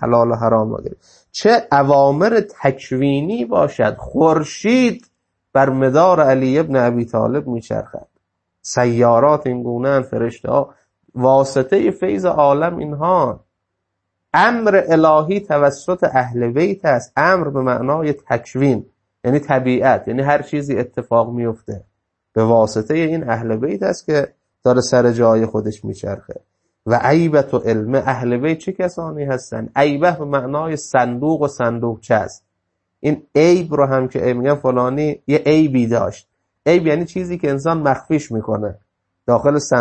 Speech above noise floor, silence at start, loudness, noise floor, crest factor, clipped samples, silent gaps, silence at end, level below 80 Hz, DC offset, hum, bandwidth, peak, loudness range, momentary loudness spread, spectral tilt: 59 dB; 0 s; -16 LUFS; -75 dBFS; 16 dB; under 0.1%; none; 0 s; -52 dBFS; under 0.1%; none; 8.8 kHz; 0 dBFS; 3 LU; 10 LU; -6.5 dB/octave